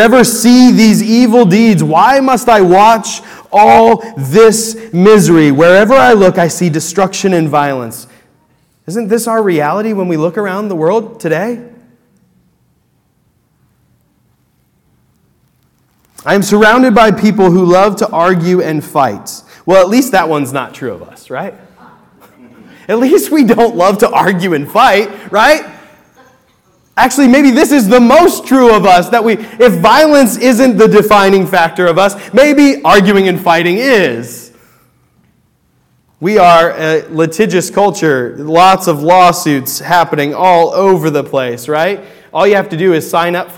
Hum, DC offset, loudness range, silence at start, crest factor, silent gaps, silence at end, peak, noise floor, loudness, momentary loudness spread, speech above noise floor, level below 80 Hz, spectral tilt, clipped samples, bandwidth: none; under 0.1%; 8 LU; 0 s; 10 dB; none; 0.05 s; 0 dBFS; -56 dBFS; -8 LUFS; 11 LU; 48 dB; -44 dBFS; -5 dB/octave; 2%; 18 kHz